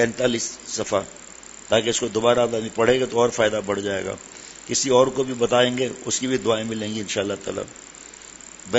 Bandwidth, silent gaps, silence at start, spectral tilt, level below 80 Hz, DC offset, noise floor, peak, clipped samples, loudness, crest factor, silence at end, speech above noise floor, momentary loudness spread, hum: 8.2 kHz; none; 0 s; -3.5 dB/octave; -56 dBFS; under 0.1%; -42 dBFS; -2 dBFS; under 0.1%; -22 LUFS; 20 dB; 0 s; 20 dB; 20 LU; none